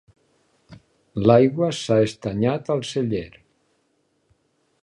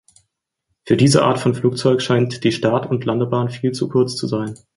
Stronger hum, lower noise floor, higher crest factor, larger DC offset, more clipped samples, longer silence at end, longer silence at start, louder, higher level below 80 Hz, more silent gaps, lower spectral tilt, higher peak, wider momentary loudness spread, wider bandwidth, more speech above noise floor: neither; second, -68 dBFS vs -74 dBFS; about the same, 22 dB vs 18 dB; neither; neither; first, 1.55 s vs 0.2 s; second, 0.7 s vs 0.85 s; second, -21 LUFS vs -18 LUFS; about the same, -54 dBFS vs -54 dBFS; neither; about the same, -6.5 dB/octave vs -6 dB/octave; about the same, -2 dBFS vs -2 dBFS; first, 12 LU vs 8 LU; about the same, 11.5 kHz vs 11.5 kHz; second, 48 dB vs 57 dB